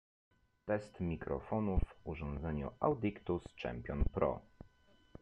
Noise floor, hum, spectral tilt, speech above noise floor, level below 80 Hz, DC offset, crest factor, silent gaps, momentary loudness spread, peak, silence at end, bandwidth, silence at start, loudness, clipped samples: -68 dBFS; none; -9 dB/octave; 30 dB; -46 dBFS; under 0.1%; 22 dB; none; 9 LU; -18 dBFS; 0.8 s; 9.2 kHz; 0.65 s; -39 LUFS; under 0.1%